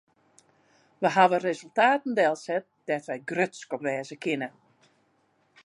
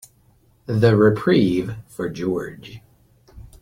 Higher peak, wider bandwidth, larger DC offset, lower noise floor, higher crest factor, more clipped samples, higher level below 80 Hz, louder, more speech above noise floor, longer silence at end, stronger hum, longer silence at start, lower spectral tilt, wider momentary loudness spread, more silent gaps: second, -6 dBFS vs -2 dBFS; second, 11.5 kHz vs 15.5 kHz; neither; first, -68 dBFS vs -57 dBFS; about the same, 22 dB vs 18 dB; neither; second, -82 dBFS vs -50 dBFS; second, -27 LUFS vs -20 LUFS; first, 42 dB vs 38 dB; first, 1.15 s vs 0.15 s; neither; first, 1 s vs 0.7 s; second, -5 dB/octave vs -8 dB/octave; second, 11 LU vs 23 LU; neither